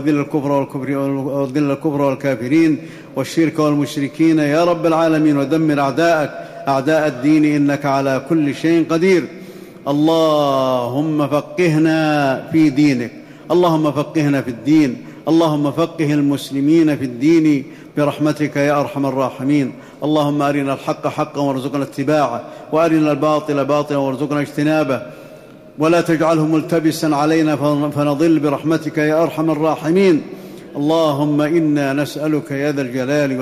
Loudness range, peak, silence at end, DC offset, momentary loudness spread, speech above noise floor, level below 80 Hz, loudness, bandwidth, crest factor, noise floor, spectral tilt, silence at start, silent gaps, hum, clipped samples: 2 LU; -6 dBFS; 0 s; under 0.1%; 7 LU; 23 dB; -58 dBFS; -16 LUFS; 14.5 kHz; 10 dB; -39 dBFS; -6.5 dB/octave; 0 s; none; none; under 0.1%